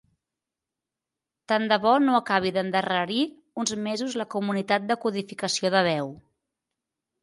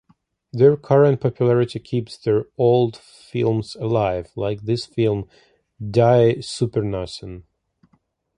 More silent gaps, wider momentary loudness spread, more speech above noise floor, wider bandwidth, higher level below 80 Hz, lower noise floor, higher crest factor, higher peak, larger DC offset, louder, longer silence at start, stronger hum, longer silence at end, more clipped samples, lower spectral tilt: neither; second, 9 LU vs 15 LU; first, 63 dB vs 45 dB; about the same, 11.5 kHz vs 10.5 kHz; second, -70 dBFS vs -50 dBFS; first, -88 dBFS vs -65 dBFS; about the same, 18 dB vs 18 dB; second, -8 dBFS vs -2 dBFS; neither; second, -25 LUFS vs -20 LUFS; first, 1.5 s vs 0.55 s; neither; about the same, 1.05 s vs 0.95 s; neither; second, -4 dB/octave vs -7.5 dB/octave